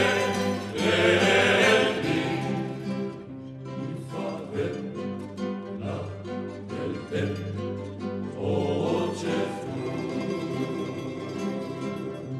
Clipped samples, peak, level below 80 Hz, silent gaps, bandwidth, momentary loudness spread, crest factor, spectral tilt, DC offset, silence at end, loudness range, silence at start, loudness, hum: under 0.1%; -8 dBFS; -62 dBFS; none; 14 kHz; 15 LU; 20 dB; -5 dB/octave; under 0.1%; 0 s; 10 LU; 0 s; -27 LUFS; none